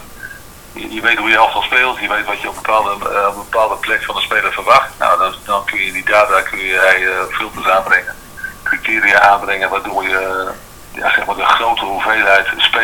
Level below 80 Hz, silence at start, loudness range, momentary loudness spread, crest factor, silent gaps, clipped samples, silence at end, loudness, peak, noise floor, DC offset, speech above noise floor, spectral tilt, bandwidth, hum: -42 dBFS; 0 s; 2 LU; 12 LU; 14 dB; none; under 0.1%; 0 s; -13 LUFS; 0 dBFS; -35 dBFS; under 0.1%; 20 dB; -2 dB/octave; 19.5 kHz; none